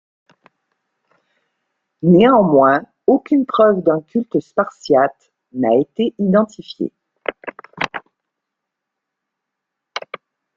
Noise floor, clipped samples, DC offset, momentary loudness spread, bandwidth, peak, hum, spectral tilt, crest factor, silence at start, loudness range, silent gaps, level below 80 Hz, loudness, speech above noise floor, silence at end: -80 dBFS; under 0.1%; under 0.1%; 19 LU; 7.4 kHz; 0 dBFS; none; -8 dB/octave; 18 dB; 2.05 s; 15 LU; none; -60 dBFS; -16 LUFS; 65 dB; 0.55 s